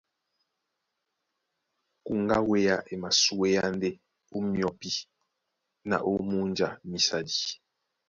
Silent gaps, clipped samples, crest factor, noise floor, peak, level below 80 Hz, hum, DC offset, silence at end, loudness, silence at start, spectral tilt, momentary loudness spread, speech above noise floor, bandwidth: none; under 0.1%; 20 dB; -82 dBFS; -10 dBFS; -60 dBFS; none; under 0.1%; 0.55 s; -28 LUFS; 2.05 s; -3.5 dB/octave; 11 LU; 54 dB; 7.6 kHz